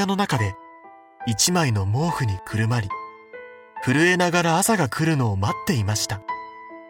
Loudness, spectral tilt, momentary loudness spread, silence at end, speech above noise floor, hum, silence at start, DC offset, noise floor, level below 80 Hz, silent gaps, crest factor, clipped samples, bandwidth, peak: -22 LUFS; -4.5 dB/octave; 20 LU; 0 s; 26 dB; none; 0 s; under 0.1%; -47 dBFS; -54 dBFS; none; 18 dB; under 0.1%; 18.5 kHz; -4 dBFS